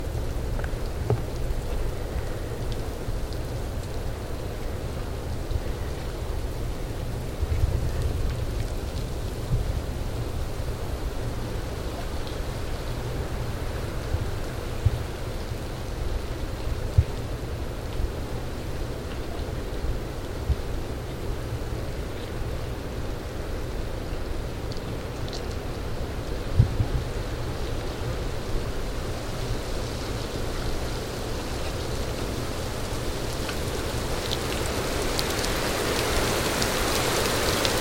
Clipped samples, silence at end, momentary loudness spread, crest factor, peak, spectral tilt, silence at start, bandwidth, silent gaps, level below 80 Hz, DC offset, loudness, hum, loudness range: under 0.1%; 0 s; 9 LU; 22 dB; -6 dBFS; -4.5 dB/octave; 0 s; 16.5 kHz; none; -32 dBFS; 0.2%; -30 LUFS; none; 6 LU